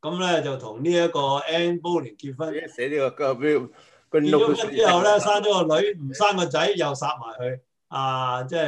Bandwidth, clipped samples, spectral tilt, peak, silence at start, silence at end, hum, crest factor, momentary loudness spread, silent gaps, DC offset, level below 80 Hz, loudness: 10 kHz; under 0.1%; -4.5 dB/octave; -6 dBFS; 0.05 s; 0 s; none; 16 dB; 12 LU; none; under 0.1%; -70 dBFS; -23 LUFS